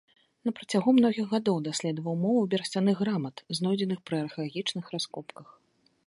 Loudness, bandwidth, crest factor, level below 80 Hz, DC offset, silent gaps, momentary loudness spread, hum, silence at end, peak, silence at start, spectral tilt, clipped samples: -29 LUFS; 11.5 kHz; 18 dB; -74 dBFS; under 0.1%; none; 11 LU; none; 0.65 s; -10 dBFS; 0.45 s; -5.5 dB/octave; under 0.1%